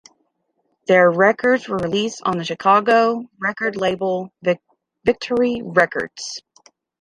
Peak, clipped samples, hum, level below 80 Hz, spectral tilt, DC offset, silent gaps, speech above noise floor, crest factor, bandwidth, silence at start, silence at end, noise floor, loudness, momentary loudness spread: -2 dBFS; under 0.1%; none; -58 dBFS; -5 dB/octave; under 0.1%; none; 51 dB; 18 dB; 11 kHz; 0.9 s; 0.6 s; -70 dBFS; -19 LUFS; 12 LU